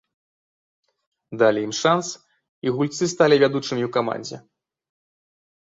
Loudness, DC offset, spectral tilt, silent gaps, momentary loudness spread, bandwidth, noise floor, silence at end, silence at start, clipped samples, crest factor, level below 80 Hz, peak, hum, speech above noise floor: -21 LUFS; under 0.1%; -4.5 dB/octave; 2.49-2.62 s; 18 LU; 7.8 kHz; under -90 dBFS; 1.3 s; 1.3 s; under 0.1%; 20 dB; -66 dBFS; -4 dBFS; none; over 69 dB